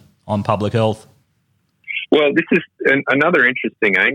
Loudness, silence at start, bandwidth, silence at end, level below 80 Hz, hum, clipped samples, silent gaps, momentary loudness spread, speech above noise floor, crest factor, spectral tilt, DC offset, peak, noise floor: -16 LUFS; 0.25 s; 11 kHz; 0 s; -58 dBFS; none; under 0.1%; none; 10 LU; 48 dB; 16 dB; -6.5 dB/octave; under 0.1%; -2 dBFS; -64 dBFS